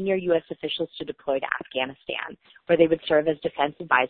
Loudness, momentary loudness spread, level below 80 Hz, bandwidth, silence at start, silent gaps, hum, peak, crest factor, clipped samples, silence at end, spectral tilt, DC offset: -25 LUFS; 12 LU; -62 dBFS; 4.6 kHz; 0 s; none; none; -4 dBFS; 22 dB; under 0.1%; 0 s; -9.5 dB/octave; under 0.1%